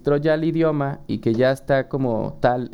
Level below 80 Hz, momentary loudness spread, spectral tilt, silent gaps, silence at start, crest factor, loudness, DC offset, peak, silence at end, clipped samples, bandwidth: -46 dBFS; 6 LU; -8 dB/octave; none; 0.05 s; 16 dB; -21 LUFS; under 0.1%; -4 dBFS; 0 s; under 0.1%; 12.5 kHz